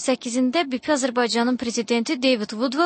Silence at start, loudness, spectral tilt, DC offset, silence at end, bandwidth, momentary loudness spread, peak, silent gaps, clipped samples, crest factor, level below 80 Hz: 0 s; -22 LUFS; -3 dB/octave; under 0.1%; 0 s; 8.8 kHz; 3 LU; -8 dBFS; none; under 0.1%; 14 dB; -66 dBFS